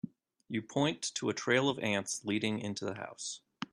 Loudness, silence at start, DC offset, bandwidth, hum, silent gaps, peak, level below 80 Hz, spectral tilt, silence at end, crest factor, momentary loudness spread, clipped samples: -34 LUFS; 0.05 s; under 0.1%; 13 kHz; none; none; -14 dBFS; -76 dBFS; -4 dB/octave; 0.1 s; 20 dB; 12 LU; under 0.1%